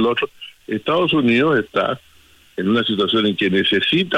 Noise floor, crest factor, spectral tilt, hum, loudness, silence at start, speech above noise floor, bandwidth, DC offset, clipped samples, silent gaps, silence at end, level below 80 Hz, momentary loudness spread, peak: -50 dBFS; 12 dB; -6.5 dB/octave; none; -18 LUFS; 0 s; 32 dB; 14.5 kHz; under 0.1%; under 0.1%; none; 0 s; -58 dBFS; 12 LU; -6 dBFS